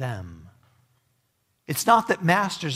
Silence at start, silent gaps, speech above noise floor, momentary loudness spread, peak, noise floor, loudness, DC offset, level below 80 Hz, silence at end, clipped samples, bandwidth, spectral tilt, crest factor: 0 s; none; 48 dB; 17 LU; -4 dBFS; -71 dBFS; -22 LUFS; under 0.1%; -64 dBFS; 0 s; under 0.1%; 16 kHz; -4.5 dB/octave; 22 dB